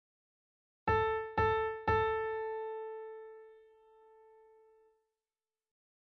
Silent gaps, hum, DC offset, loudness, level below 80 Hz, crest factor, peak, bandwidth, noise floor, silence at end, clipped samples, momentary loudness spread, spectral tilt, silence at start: none; none; under 0.1%; -34 LUFS; -56 dBFS; 20 dB; -18 dBFS; 6.2 kHz; under -90 dBFS; 2.45 s; under 0.1%; 17 LU; -4 dB/octave; 0.85 s